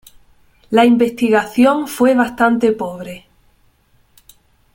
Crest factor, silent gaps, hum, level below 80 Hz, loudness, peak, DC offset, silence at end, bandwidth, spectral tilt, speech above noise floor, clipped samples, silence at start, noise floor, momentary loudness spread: 16 dB; none; none; -54 dBFS; -14 LUFS; 0 dBFS; under 0.1%; 1.55 s; 17 kHz; -5 dB/octave; 41 dB; under 0.1%; 0.7 s; -55 dBFS; 15 LU